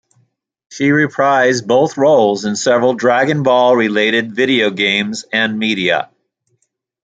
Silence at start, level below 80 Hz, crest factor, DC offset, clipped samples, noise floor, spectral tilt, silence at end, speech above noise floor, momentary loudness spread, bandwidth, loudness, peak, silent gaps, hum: 0.7 s; -60 dBFS; 14 dB; under 0.1%; under 0.1%; -66 dBFS; -4.5 dB/octave; 1 s; 53 dB; 5 LU; 9.4 kHz; -13 LUFS; 0 dBFS; none; none